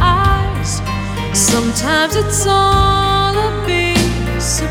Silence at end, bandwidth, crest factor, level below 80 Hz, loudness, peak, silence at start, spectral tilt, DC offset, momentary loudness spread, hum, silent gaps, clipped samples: 0 s; 18 kHz; 14 dB; -24 dBFS; -14 LUFS; 0 dBFS; 0 s; -3.5 dB/octave; under 0.1%; 7 LU; none; none; under 0.1%